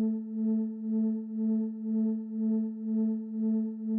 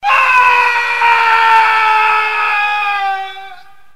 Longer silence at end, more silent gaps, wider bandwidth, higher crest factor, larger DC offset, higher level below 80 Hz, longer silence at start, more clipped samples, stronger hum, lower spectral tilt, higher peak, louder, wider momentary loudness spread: second, 0 s vs 0.4 s; neither; second, 1.9 kHz vs 15.5 kHz; about the same, 8 dB vs 12 dB; second, under 0.1% vs 2%; second, -88 dBFS vs -56 dBFS; about the same, 0 s vs 0 s; neither; neither; first, -14 dB/octave vs 0.5 dB/octave; second, -22 dBFS vs 0 dBFS; second, -31 LUFS vs -10 LUFS; second, 2 LU vs 10 LU